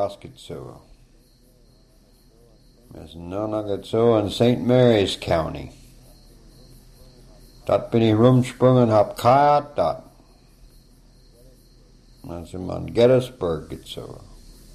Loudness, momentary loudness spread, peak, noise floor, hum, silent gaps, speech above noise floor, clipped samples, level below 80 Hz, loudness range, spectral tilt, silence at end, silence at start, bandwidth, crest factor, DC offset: -20 LUFS; 21 LU; -4 dBFS; -54 dBFS; none; none; 34 dB; under 0.1%; -48 dBFS; 13 LU; -7 dB/octave; 0.55 s; 0 s; 13.5 kHz; 20 dB; under 0.1%